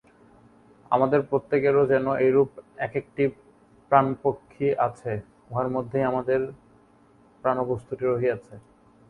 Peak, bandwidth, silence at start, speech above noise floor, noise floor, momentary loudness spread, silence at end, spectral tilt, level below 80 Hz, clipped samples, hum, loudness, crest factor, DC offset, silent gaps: -4 dBFS; 4.4 kHz; 0.9 s; 33 dB; -57 dBFS; 10 LU; 0.5 s; -9 dB/octave; -60 dBFS; under 0.1%; none; -25 LUFS; 22 dB; under 0.1%; none